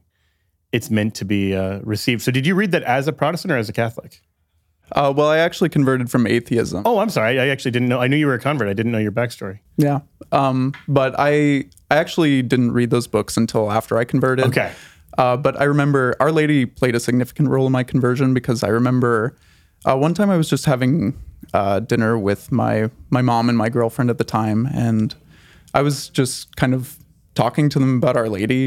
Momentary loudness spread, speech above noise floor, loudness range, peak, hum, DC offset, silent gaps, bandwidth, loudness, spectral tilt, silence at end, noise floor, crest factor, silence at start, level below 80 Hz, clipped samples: 6 LU; 48 dB; 3 LU; 0 dBFS; none; under 0.1%; none; 16 kHz; -19 LUFS; -6.5 dB/octave; 0 s; -66 dBFS; 18 dB; 0.75 s; -52 dBFS; under 0.1%